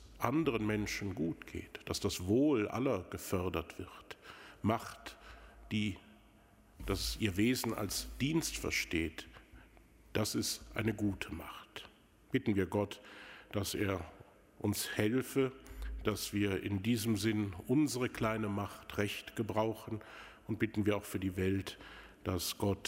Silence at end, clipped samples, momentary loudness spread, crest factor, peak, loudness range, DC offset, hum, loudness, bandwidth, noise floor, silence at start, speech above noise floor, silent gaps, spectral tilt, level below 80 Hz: 0 s; under 0.1%; 17 LU; 24 dB; -14 dBFS; 4 LU; under 0.1%; none; -36 LUFS; 16 kHz; -63 dBFS; 0 s; 28 dB; none; -5 dB/octave; -54 dBFS